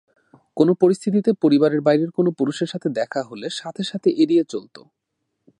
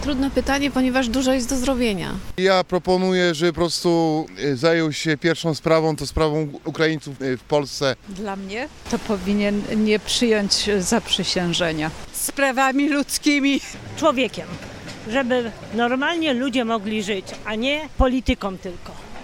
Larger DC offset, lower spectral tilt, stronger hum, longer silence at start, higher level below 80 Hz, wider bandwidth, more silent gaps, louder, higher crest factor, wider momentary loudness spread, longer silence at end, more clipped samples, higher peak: neither; first, -6.5 dB/octave vs -4.5 dB/octave; neither; first, 0.55 s vs 0 s; second, -72 dBFS vs -38 dBFS; second, 11 kHz vs 17 kHz; neither; about the same, -20 LUFS vs -21 LUFS; about the same, 18 dB vs 18 dB; about the same, 12 LU vs 10 LU; first, 1 s vs 0 s; neither; about the same, -4 dBFS vs -4 dBFS